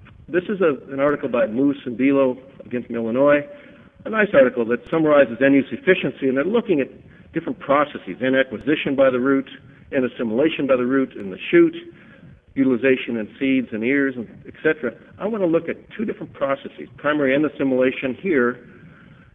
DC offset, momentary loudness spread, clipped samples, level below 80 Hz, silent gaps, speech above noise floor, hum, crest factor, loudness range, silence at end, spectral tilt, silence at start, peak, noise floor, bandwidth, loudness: under 0.1%; 13 LU; under 0.1%; -58 dBFS; none; 26 dB; none; 18 dB; 4 LU; 0.45 s; -9 dB/octave; 0.3 s; -2 dBFS; -46 dBFS; 3.9 kHz; -20 LUFS